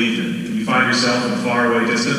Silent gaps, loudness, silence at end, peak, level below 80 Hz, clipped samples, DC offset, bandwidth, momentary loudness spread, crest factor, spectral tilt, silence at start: none; -17 LUFS; 0 s; -4 dBFS; -54 dBFS; under 0.1%; under 0.1%; 15 kHz; 7 LU; 14 dB; -4 dB/octave; 0 s